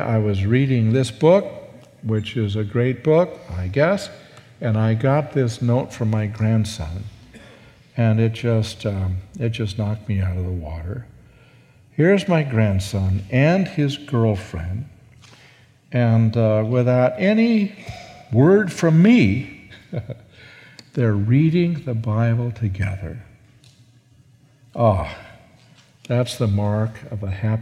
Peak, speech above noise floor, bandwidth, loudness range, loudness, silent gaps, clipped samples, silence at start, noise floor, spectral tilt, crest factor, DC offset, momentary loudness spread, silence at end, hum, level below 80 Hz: -2 dBFS; 34 dB; 11.5 kHz; 7 LU; -20 LUFS; none; under 0.1%; 0 s; -53 dBFS; -7.5 dB/octave; 18 dB; under 0.1%; 16 LU; 0 s; none; -46 dBFS